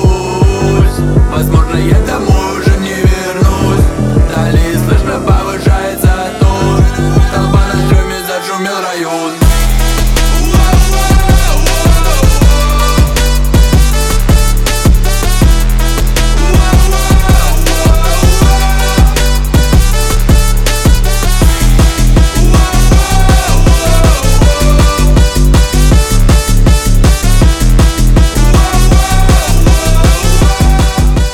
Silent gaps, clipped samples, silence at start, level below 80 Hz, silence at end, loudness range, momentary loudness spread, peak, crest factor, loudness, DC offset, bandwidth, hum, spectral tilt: none; 0.4%; 0 s; -8 dBFS; 0 s; 2 LU; 3 LU; 0 dBFS; 8 dB; -10 LUFS; under 0.1%; 17 kHz; none; -5 dB/octave